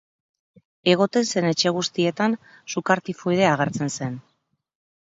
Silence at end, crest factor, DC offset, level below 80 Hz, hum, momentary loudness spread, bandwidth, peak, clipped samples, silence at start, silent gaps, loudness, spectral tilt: 0.95 s; 20 dB; under 0.1%; -66 dBFS; none; 11 LU; 8 kHz; -4 dBFS; under 0.1%; 0.85 s; none; -22 LUFS; -4.5 dB/octave